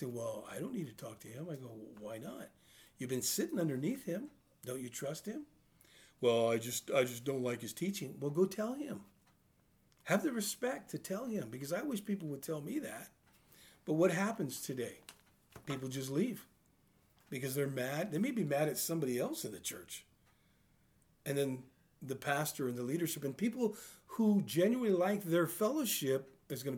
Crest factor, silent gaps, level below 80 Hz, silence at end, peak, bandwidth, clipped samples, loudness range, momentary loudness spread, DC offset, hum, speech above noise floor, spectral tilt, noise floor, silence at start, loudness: 20 dB; none; -78 dBFS; 0 s; -18 dBFS; over 20 kHz; under 0.1%; 7 LU; 16 LU; under 0.1%; none; 35 dB; -5 dB/octave; -71 dBFS; 0 s; -37 LUFS